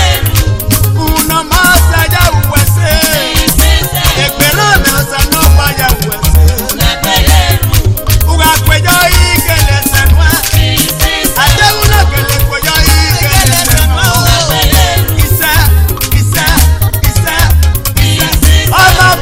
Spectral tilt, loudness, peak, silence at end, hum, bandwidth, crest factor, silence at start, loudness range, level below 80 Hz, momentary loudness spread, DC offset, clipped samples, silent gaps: -3.5 dB/octave; -8 LUFS; 0 dBFS; 0 s; none; over 20 kHz; 8 dB; 0 s; 1 LU; -14 dBFS; 4 LU; under 0.1%; 3%; none